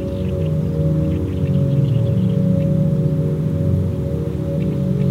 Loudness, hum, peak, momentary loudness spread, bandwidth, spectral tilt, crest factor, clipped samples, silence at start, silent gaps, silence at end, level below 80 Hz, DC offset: -19 LUFS; none; -6 dBFS; 4 LU; 6.8 kHz; -10 dB/octave; 12 dB; under 0.1%; 0 s; none; 0 s; -34 dBFS; under 0.1%